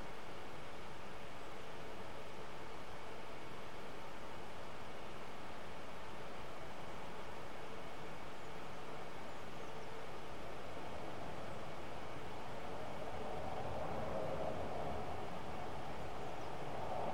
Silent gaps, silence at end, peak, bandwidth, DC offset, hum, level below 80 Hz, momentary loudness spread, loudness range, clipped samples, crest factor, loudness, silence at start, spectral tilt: none; 0 s; -28 dBFS; 16 kHz; 1%; none; -64 dBFS; 7 LU; 6 LU; under 0.1%; 18 dB; -48 LUFS; 0 s; -5 dB/octave